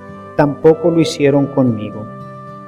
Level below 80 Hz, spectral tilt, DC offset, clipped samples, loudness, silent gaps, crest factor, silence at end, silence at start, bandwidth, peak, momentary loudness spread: -48 dBFS; -7 dB/octave; under 0.1%; under 0.1%; -14 LUFS; none; 14 dB; 0 s; 0 s; 12.5 kHz; 0 dBFS; 18 LU